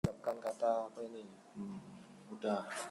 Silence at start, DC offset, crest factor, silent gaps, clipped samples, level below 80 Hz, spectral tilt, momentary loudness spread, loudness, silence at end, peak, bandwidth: 0.05 s; under 0.1%; 20 dB; none; under 0.1%; -64 dBFS; -6 dB/octave; 17 LU; -40 LUFS; 0 s; -20 dBFS; 15.5 kHz